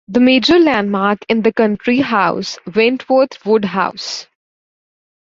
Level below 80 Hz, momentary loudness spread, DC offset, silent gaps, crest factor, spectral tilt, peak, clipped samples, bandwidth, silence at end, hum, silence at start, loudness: -52 dBFS; 9 LU; under 0.1%; none; 14 dB; -5 dB/octave; 0 dBFS; under 0.1%; 7.6 kHz; 0.95 s; none; 0.1 s; -14 LUFS